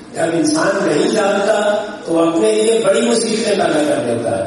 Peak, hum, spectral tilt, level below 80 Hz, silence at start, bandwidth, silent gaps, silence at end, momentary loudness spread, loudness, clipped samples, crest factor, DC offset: -2 dBFS; none; -4 dB/octave; -58 dBFS; 0 s; 11.5 kHz; none; 0 s; 4 LU; -15 LUFS; under 0.1%; 12 dB; under 0.1%